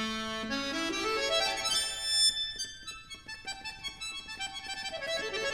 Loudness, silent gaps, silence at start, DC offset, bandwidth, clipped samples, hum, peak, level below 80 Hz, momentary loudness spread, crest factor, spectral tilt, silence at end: -31 LUFS; none; 0 s; under 0.1%; 18 kHz; under 0.1%; none; -16 dBFS; -58 dBFS; 15 LU; 18 dB; -0.5 dB/octave; 0 s